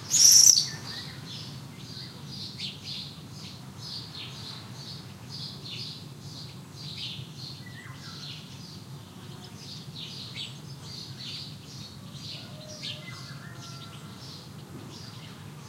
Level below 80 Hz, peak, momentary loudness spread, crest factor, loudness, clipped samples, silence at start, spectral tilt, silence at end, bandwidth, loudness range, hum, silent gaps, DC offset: -66 dBFS; -2 dBFS; 8 LU; 30 dB; -24 LUFS; under 0.1%; 0 s; -0.5 dB/octave; 0 s; 16 kHz; 3 LU; none; none; under 0.1%